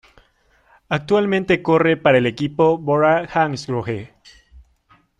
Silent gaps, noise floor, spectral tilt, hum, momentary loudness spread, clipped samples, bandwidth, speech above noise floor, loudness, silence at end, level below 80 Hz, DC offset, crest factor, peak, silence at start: none; -58 dBFS; -7 dB/octave; none; 10 LU; under 0.1%; 9.8 kHz; 41 dB; -18 LUFS; 0.6 s; -52 dBFS; under 0.1%; 16 dB; -2 dBFS; 0.9 s